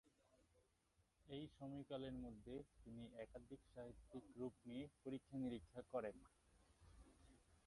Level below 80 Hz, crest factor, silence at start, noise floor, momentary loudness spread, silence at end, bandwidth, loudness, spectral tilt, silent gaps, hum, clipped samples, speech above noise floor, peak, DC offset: -72 dBFS; 20 dB; 0.05 s; -83 dBFS; 10 LU; 0.05 s; 11 kHz; -55 LUFS; -7 dB/octave; none; none; under 0.1%; 29 dB; -34 dBFS; under 0.1%